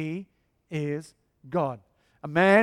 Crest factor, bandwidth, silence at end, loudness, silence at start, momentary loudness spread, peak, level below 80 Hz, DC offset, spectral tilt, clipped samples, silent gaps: 20 dB; 12 kHz; 0 s; -28 LUFS; 0 s; 17 LU; -6 dBFS; -66 dBFS; under 0.1%; -7 dB/octave; under 0.1%; none